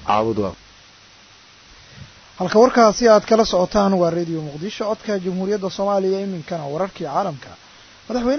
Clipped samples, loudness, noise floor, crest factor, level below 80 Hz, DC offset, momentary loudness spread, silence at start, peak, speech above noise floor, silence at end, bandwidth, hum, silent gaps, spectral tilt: under 0.1%; -19 LUFS; -48 dBFS; 18 dB; -48 dBFS; under 0.1%; 14 LU; 0 s; -2 dBFS; 29 dB; 0 s; 6.6 kHz; none; none; -5.5 dB/octave